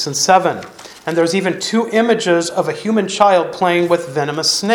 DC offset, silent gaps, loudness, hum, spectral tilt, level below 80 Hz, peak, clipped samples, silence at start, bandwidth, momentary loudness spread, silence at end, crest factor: under 0.1%; none; -15 LUFS; none; -3.5 dB/octave; -60 dBFS; 0 dBFS; under 0.1%; 0 s; 19.5 kHz; 8 LU; 0 s; 16 dB